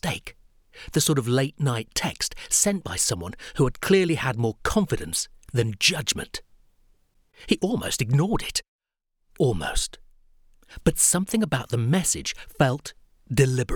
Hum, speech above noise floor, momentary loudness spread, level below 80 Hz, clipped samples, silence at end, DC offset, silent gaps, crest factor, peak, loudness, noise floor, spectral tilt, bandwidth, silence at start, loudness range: none; 51 dB; 10 LU; -42 dBFS; under 0.1%; 0 s; under 0.1%; 8.68-8.79 s; 20 dB; -6 dBFS; -24 LUFS; -75 dBFS; -4 dB/octave; over 20 kHz; 0.05 s; 4 LU